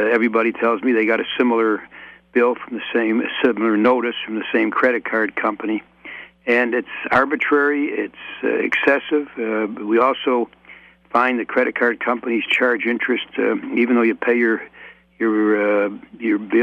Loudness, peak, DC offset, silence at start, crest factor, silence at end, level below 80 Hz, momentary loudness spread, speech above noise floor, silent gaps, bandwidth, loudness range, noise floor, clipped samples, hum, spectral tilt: -19 LUFS; -4 dBFS; under 0.1%; 0 s; 16 dB; 0 s; -62 dBFS; 9 LU; 27 dB; none; 7.8 kHz; 1 LU; -46 dBFS; under 0.1%; none; -6.5 dB/octave